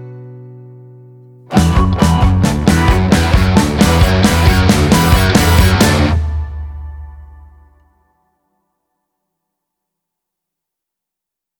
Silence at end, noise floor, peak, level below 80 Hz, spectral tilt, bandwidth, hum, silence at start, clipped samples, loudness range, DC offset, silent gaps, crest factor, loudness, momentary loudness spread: 4.35 s; -83 dBFS; 0 dBFS; -20 dBFS; -5.5 dB/octave; over 20 kHz; none; 0 s; under 0.1%; 8 LU; under 0.1%; none; 14 dB; -11 LUFS; 17 LU